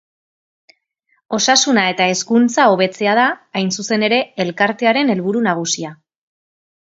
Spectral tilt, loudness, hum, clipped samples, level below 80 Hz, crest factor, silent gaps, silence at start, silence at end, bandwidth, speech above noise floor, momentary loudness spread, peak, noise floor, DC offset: -3 dB/octave; -15 LUFS; none; under 0.1%; -66 dBFS; 18 dB; none; 1.3 s; 0.9 s; 8 kHz; 49 dB; 8 LU; 0 dBFS; -65 dBFS; under 0.1%